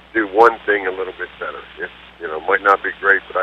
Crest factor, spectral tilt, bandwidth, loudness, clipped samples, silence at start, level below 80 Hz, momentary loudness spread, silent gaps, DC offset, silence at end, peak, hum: 18 dB; -5 dB/octave; 8.2 kHz; -17 LUFS; under 0.1%; 0.15 s; -54 dBFS; 17 LU; none; under 0.1%; 0 s; 0 dBFS; none